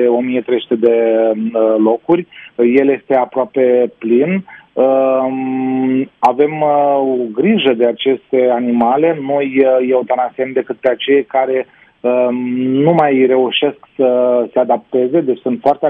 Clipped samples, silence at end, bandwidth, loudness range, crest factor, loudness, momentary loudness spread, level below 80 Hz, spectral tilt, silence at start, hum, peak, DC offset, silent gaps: under 0.1%; 0 s; 4.5 kHz; 1 LU; 12 dB; -14 LUFS; 5 LU; -62 dBFS; -8.5 dB/octave; 0 s; none; 0 dBFS; under 0.1%; none